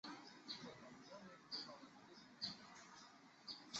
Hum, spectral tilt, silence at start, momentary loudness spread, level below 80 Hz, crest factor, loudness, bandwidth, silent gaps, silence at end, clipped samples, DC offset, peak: none; -1 dB/octave; 0.05 s; 12 LU; -90 dBFS; 24 dB; -54 LUFS; 8 kHz; none; 0 s; under 0.1%; under 0.1%; -32 dBFS